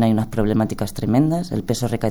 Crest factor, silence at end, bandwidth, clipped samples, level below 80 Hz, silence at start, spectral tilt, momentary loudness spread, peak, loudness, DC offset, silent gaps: 14 dB; 0 s; over 20 kHz; under 0.1%; -38 dBFS; 0 s; -7 dB/octave; 5 LU; -4 dBFS; -21 LUFS; under 0.1%; none